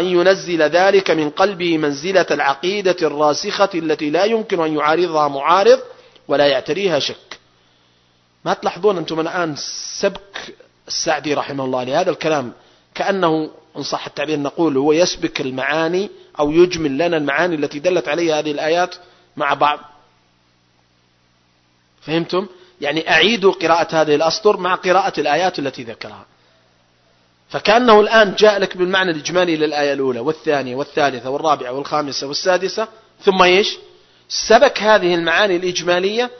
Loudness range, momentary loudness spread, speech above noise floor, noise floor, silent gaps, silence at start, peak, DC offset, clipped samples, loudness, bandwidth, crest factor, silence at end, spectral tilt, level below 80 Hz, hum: 7 LU; 11 LU; 42 dB; -58 dBFS; none; 0 s; 0 dBFS; under 0.1%; under 0.1%; -17 LUFS; 6.4 kHz; 18 dB; 0 s; -4 dB/octave; -54 dBFS; 60 Hz at -55 dBFS